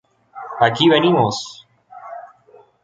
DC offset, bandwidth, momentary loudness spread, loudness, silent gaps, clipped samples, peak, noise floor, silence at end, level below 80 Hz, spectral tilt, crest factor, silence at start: under 0.1%; 7.8 kHz; 23 LU; -16 LUFS; none; under 0.1%; -2 dBFS; -50 dBFS; 0.55 s; -58 dBFS; -5 dB/octave; 18 dB; 0.35 s